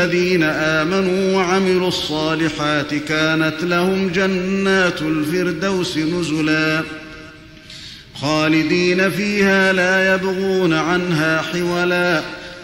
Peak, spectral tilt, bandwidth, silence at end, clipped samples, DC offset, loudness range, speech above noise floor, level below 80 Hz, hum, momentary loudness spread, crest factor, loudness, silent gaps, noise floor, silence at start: -4 dBFS; -5 dB/octave; 16.5 kHz; 0 s; under 0.1%; under 0.1%; 4 LU; 22 dB; -48 dBFS; none; 6 LU; 14 dB; -17 LUFS; none; -39 dBFS; 0 s